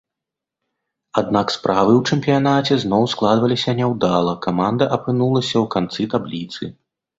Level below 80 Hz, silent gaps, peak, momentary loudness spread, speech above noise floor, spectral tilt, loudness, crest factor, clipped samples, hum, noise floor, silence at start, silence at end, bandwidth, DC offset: -54 dBFS; none; 0 dBFS; 8 LU; 67 dB; -6.5 dB/octave; -18 LUFS; 18 dB; under 0.1%; none; -85 dBFS; 1.15 s; 0.5 s; 8 kHz; under 0.1%